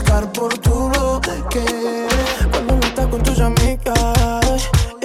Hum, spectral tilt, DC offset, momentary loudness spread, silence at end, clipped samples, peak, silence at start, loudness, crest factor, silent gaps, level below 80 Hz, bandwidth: none; -5 dB/octave; under 0.1%; 4 LU; 0 s; under 0.1%; -4 dBFS; 0 s; -17 LUFS; 12 dB; none; -20 dBFS; 16 kHz